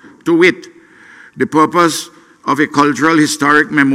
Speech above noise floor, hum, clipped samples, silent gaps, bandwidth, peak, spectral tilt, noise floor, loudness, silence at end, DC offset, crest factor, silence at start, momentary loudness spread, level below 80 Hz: 29 dB; none; under 0.1%; none; 15.5 kHz; 0 dBFS; -4.5 dB/octave; -41 dBFS; -12 LUFS; 0 s; under 0.1%; 14 dB; 0.25 s; 12 LU; -58 dBFS